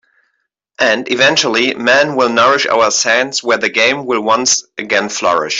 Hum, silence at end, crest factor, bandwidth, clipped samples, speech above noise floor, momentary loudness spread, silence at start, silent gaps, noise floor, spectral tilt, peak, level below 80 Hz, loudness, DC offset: none; 0 s; 12 dB; 8 kHz; under 0.1%; 55 dB; 5 LU; 0.8 s; none; -68 dBFS; -1.5 dB/octave; 0 dBFS; -60 dBFS; -12 LUFS; under 0.1%